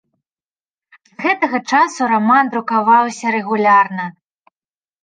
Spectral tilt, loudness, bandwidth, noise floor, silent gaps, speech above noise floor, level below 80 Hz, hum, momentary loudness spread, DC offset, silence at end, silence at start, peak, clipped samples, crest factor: -4.5 dB/octave; -15 LUFS; 9.6 kHz; under -90 dBFS; none; over 75 dB; -72 dBFS; none; 8 LU; under 0.1%; 0.95 s; 1.2 s; -2 dBFS; under 0.1%; 16 dB